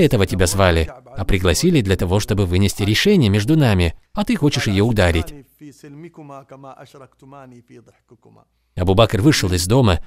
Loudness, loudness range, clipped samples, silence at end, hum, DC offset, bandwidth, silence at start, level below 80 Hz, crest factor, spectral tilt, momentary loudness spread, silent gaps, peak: -17 LUFS; 8 LU; under 0.1%; 0 s; none; under 0.1%; 16 kHz; 0 s; -32 dBFS; 18 dB; -5.5 dB/octave; 17 LU; none; 0 dBFS